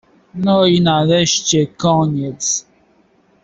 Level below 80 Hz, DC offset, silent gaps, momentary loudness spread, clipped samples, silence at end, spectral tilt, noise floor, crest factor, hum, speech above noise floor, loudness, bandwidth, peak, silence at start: -50 dBFS; under 0.1%; none; 8 LU; under 0.1%; 0.85 s; -4.5 dB/octave; -55 dBFS; 14 dB; none; 40 dB; -15 LUFS; 8 kHz; -2 dBFS; 0.35 s